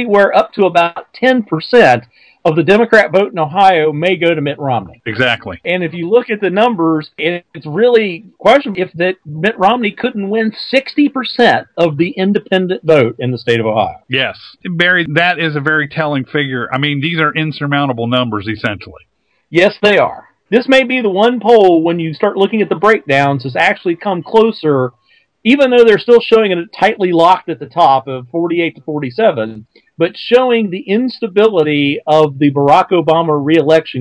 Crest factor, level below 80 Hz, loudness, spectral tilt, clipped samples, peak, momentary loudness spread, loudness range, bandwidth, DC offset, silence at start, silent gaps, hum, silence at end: 12 dB; -54 dBFS; -12 LUFS; -6.5 dB/octave; 0.6%; 0 dBFS; 9 LU; 4 LU; 11 kHz; under 0.1%; 0 s; none; none; 0 s